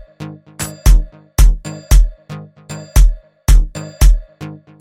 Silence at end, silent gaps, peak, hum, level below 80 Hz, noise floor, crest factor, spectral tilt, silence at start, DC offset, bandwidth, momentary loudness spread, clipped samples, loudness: 0.25 s; none; 0 dBFS; none; -14 dBFS; -33 dBFS; 12 dB; -5 dB/octave; 0.2 s; under 0.1%; 15.5 kHz; 18 LU; under 0.1%; -16 LUFS